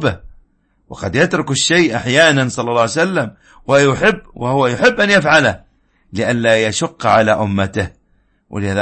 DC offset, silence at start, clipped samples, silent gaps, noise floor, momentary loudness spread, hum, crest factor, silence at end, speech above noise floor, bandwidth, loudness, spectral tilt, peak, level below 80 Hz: under 0.1%; 0 s; under 0.1%; none; -58 dBFS; 14 LU; none; 16 dB; 0 s; 44 dB; 8.8 kHz; -14 LUFS; -4.5 dB/octave; 0 dBFS; -44 dBFS